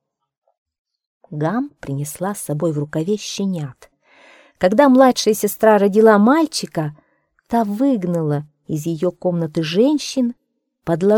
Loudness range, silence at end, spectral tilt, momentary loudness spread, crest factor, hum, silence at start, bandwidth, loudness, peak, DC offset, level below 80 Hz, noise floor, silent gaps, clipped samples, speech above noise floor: 9 LU; 0 s; -5.5 dB/octave; 14 LU; 18 dB; none; 1.3 s; 18 kHz; -18 LUFS; 0 dBFS; under 0.1%; -58 dBFS; -49 dBFS; none; under 0.1%; 33 dB